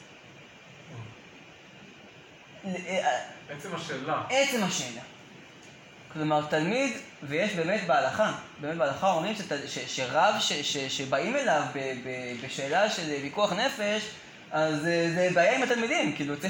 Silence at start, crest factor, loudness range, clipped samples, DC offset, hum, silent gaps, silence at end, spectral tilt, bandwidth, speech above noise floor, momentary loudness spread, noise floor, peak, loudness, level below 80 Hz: 0 s; 18 dB; 7 LU; under 0.1%; under 0.1%; none; none; 0 s; -3.5 dB/octave; 17 kHz; 23 dB; 22 LU; -51 dBFS; -10 dBFS; -28 LUFS; -72 dBFS